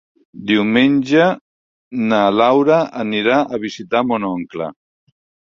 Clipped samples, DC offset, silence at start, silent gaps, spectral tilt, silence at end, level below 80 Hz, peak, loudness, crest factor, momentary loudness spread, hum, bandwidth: under 0.1%; under 0.1%; 0.35 s; 1.41-1.91 s; -6 dB/octave; 0.9 s; -58 dBFS; 0 dBFS; -16 LUFS; 16 dB; 14 LU; none; 7.4 kHz